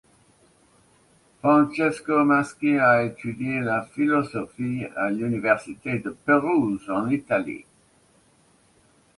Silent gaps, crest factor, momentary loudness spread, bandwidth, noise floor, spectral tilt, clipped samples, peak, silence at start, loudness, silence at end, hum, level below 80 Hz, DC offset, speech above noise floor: none; 20 dB; 10 LU; 11.5 kHz; -60 dBFS; -7.5 dB/octave; under 0.1%; -6 dBFS; 1.45 s; -23 LUFS; 1.55 s; none; -62 dBFS; under 0.1%; 37 dB